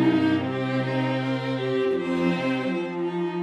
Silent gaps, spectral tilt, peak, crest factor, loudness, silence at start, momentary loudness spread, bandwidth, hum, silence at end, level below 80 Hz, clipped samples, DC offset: none; -7.5 dB/octave; -10 dBFS; 14 dB; -25 LUFS; 0 s; 5 LU; 10.5 kHz; none; 0 s; -66 dBFS; under 0.1%; under 0.1%